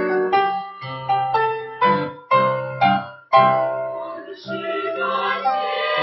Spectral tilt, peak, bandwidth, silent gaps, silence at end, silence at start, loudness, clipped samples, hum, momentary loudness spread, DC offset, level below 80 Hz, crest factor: -7.5 dB/octave; -2 dBFS; 6 kHz; none; 0 s; 0 s; -20 LUFS; under 0.1%; none; 12 LU; under 0.1%; -64 dBFS; 18 dB